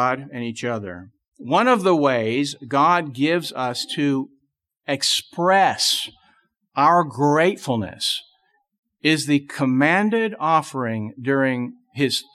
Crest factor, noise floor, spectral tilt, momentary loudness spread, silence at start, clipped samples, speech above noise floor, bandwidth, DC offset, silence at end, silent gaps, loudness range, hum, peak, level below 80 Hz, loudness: 16 dB; -71 dBFS; -4 dB/octave; 11 LU; 0 s; under 0.1%; 51 dB; 14 kHz; under 0.1%; 0.15 s; 1.28-1.32 s, 8.78-8.83 s; 2 LU; none; -4 dBFS; -68 dBFS; -20 LUFS